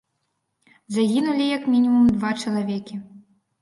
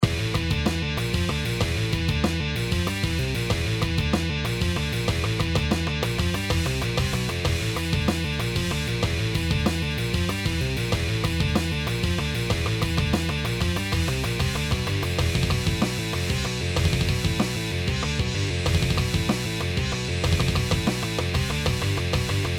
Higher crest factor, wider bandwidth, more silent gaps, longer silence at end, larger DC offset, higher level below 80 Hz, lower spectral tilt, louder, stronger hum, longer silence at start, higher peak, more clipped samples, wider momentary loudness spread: second, 14 dB vs 20 dB; second, 11.5 kHz vs 19 kHz; neither; first, 0.45 s vs 0 s; neither; second, -56 dBFS vs -32 dBFS; about the same, -6 dB/octave vs -5 dB/octave; first, -21 LUFS vs -25 LUFS; neither; first, 0.9 s vs 0 s; second, -10 dBFS vs -4 dBFS; neither; first, 13 LU vs 2 LU